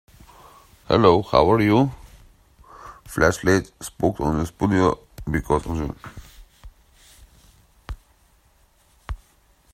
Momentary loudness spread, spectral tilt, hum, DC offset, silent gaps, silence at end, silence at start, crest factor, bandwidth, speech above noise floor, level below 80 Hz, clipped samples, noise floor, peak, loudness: 24 LU; -6 dB/octave; none; under 0.1%; none; 0.55 s; 0.9 s; 22 dB; 16 kHz; 39 dB; -40 dBFS; under 0.1%; -59 dBFS; 0 dBFS; -21 LUFS